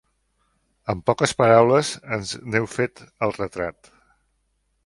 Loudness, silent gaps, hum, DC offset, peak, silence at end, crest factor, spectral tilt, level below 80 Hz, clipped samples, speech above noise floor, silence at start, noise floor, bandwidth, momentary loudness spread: -22 LUFS; none; none; under 0.1%; 0 dBFS; 1.15 s; 22 dB; -5 dB/octave; -54 dBFS; under 0.1%; 49 dB; 0.85 s; -70 dBFS; 11.5 kHz; 14 LU